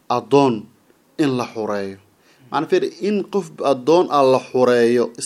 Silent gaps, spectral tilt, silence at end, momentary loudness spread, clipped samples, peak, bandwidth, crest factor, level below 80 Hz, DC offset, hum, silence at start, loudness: none; -5.5 dB/octave; 0 s; 10 LU; under 0.1%; 0 dBFS; 12.5 kHz; 18 dB; -68 dBFS; under 0.1%; none; 0.1 s; -18 LUFS